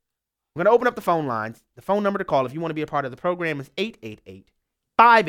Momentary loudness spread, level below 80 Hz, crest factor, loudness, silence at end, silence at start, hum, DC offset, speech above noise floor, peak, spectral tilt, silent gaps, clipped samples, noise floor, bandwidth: 19 LU; -62 dBFS; 22 dB; -23 LUFS; 0 s; 0.55 s; none; under 0.1%; 62 dB; -2 dBFS; -6 dB/octave; none; under 0.1%; -84 dBFS; 16.5 kHz